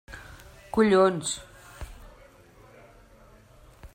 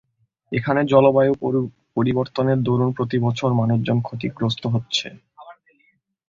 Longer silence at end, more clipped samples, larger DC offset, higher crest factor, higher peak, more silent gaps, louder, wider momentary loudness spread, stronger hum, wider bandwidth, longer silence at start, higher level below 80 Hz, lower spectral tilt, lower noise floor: second, 0.1 s vs 0.75 s; neither; neither; about the same, 20 dB vs 18 dB; second, -10 dBFS vs -2 dBFS; neither; second, -24 LUFS vs -20 LUFS; first, 27 LU vs 9 LU; neither; first, 15.5 kHz vs 7.6 kHz; second, 0.1 s vs 0.5 s; about the same, -50 dBFS vs -54 dBFS; second, -4.5 dB/octave vs -7 dB/octave; second, -54 dBFS vs -64 dBFS